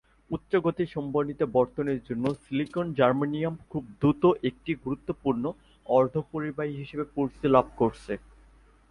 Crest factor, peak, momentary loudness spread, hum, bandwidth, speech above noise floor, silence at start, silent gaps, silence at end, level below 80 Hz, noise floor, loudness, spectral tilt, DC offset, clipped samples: 22 dB; -6 dBFS; 12 LU; none; 11 kHz; 30 dB; 0.3 s; none; 0.7 s; -56 dBFS; -57 dBFS; -28 LUFS; -8.5 dB/octave; under 0.1%; under 0.1%